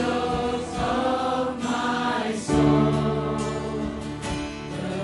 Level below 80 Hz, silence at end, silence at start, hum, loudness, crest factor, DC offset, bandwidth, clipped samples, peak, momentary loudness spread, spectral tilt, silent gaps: -42 dBFS; 0 s; 0 s; none; -25 LUFS; 16 dB; under 0.1%; 11.5 kHz; under 0.1%; -8 dBFS; 10 LU; -6 dB/octave; none